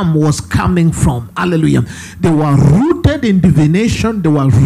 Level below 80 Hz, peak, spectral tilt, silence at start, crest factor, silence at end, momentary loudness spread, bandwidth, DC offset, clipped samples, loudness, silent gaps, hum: -30 dBFS; 0 dBFS; -7 dB/octave; 0 s; 10 dB; 0 s; 6 LU; 13 kHz; under 0.1%; under 0.1%; -12 LUFS; none; none